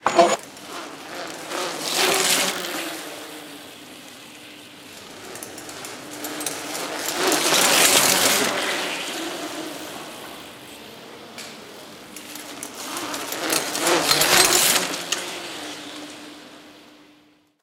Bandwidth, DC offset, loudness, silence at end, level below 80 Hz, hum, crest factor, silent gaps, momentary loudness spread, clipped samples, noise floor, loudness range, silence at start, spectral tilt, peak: 18 kHz; under 0.1%; -20 LUFS; 0.8 s; -62 dBFS; none; 24 dB; none; 25 LU; under 0.1%; -57 dBFS; 16 LU; 0 s; -0.5 dB/octave; -2 dBFS